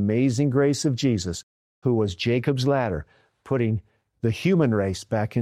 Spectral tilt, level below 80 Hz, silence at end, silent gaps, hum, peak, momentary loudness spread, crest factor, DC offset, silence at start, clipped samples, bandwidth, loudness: -6.5 dB/octave; -52 dBFS; 0 s; 1.43-1.82 s; none; -10 dBFS; 8 LU; 12 dB; under 0.1%; 0 s; under 0.1%; 13.5 kHz; -24 LUFS